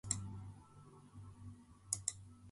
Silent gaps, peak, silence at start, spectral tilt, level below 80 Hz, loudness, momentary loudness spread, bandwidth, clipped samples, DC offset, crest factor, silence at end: none; -16 dBFS; 0.05 s; -2.5 dB/octave; -64 dBFS; -44 LUFS; 20 LU; 11.5 kHz; under 0.1%; under 0.1%; 32 dB; 0 s